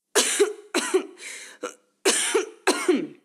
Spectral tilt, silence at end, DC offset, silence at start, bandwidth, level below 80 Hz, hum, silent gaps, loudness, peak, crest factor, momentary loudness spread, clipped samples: -0.5 dB/octave; 0.1 s; under 0.1%; 0.15 s; 16 kHz; -78 dBFS; none; none; -23 LUFS; -4 dBFS; 22 dB; 16 LU; under 0.1%